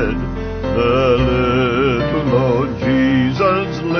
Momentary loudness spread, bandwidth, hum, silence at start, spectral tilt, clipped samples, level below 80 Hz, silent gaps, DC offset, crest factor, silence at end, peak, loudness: 6 LU; 6.6 kHz; none; 0 s; -7.5 dB/octave; under 0.1%; -30 dBFS; none; 0.1%; 14 dB; 0 s; -2 dBFS; -16 LUFS